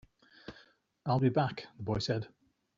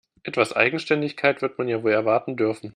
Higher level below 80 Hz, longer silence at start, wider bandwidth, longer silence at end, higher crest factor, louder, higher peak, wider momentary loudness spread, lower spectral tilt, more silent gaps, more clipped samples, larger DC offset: first, -60 dBFS vs -68 dBFS; first, 0.5 s vs 0.25 s; second, 7.6 kHz vs 10.5 kHz; first, 0.5 s vs 0.05 s; about the same, 18 dB vs 22 dB; second, -33 LUFS vs -22 LUFS; second, -16 dBFS vs -2 dBFS; first, 22 LU vs 6 LU; about the same, -6 dB/octave vs -5.5 dB/octave; neither; neither; neither